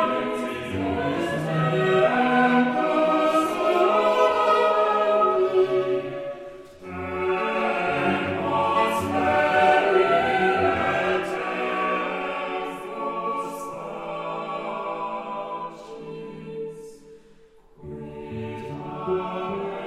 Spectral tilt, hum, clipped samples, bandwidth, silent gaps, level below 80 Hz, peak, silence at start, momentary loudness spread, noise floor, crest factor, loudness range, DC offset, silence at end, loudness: -6 dB/octave; none; under 0.1%; 15 kHz; none; -60 dBFS; -6 dBFS; 0 s; 16 LU; -52 dBFS; 16 dB; 14 LU; under 0.1%; 0 s; -23 LUFS